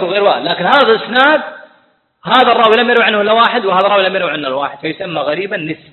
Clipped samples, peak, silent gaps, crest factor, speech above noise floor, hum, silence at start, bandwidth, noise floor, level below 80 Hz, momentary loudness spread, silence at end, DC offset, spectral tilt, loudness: under 0.1%; 0 dBFS; none; 12 dB; 42 dB; none; 0 s; 8 kHz; -54 dBFS; -60 dBFS; 11 LU; 0.15 s; under 0.1%; -6 dB/octave; -12 LUFS